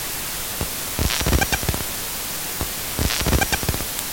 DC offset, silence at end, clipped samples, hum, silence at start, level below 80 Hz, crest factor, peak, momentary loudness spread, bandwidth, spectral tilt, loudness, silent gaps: under 0.1%; 0 s; under 0.1%; none; 0 s; -30 dBFS; 22 dB; -2 dBFS; 6 LU; 17 kHz; -3 dB/octave; -22 LUFS; none